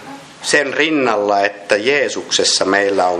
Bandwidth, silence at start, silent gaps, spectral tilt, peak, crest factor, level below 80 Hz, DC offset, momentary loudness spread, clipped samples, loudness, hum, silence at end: 13 kHz; 0 s; none; -2 dB/octave; 0 dBFS; 16 dB; -62 dBFS; under 0.1%; 4 LU; under 0.1%; -15 LUFS; none; 0 s